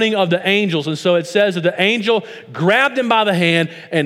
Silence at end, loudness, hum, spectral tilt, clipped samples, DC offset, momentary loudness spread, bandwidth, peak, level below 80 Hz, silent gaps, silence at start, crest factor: 0 s; -16 LUFS; none; -5.5 dB/octave; under 0.1%; under 0.1%; 5 LU; 15 kHz; 0 dBFS; -72 dBFS; none; 0 s; 16 dB